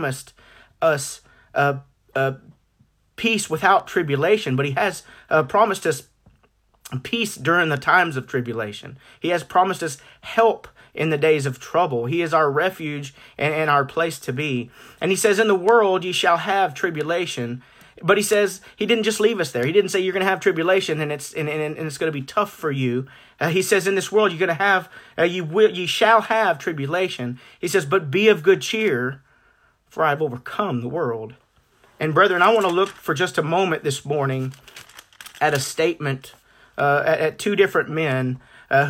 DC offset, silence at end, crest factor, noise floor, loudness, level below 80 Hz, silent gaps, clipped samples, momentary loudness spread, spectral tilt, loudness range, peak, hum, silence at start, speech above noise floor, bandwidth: under 0.1%; 0 s; 18 dB; -61 dBFS; -21 LUFS; -62 dBFS; none; under 0.1%; 13 LU; -4.5 dB/octave; 4 LU; -4 dBFS; none; 0 s; 41 dB; 16.5 kHz